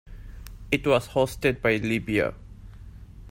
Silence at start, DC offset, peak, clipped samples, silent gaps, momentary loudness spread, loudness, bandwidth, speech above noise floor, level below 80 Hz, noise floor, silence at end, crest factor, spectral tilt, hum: 0.05 s; under 0.1%; -8 dBFS; under 0.1%; none; 23 LU; -25 LUFS; 16 kHz; 19 dB; -44 dBFS; -44 dBFS; 0 s; 20 dB; -6 dB/octave; none